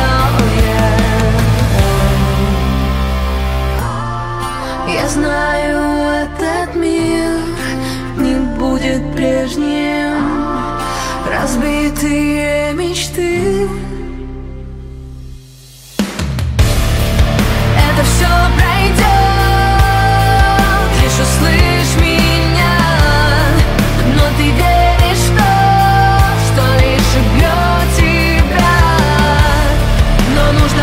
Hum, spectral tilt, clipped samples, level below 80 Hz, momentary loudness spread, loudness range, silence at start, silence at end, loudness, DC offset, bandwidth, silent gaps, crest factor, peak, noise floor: none; -5.5 dB/octave; under 0.1%; -18 dBFS; 8 LU; 6 LU; 0 s; 0 s; -13 LUFS; under 0.1%; 16.5 kHz; none; 12 dB; 0 dBFS; -36 dBFS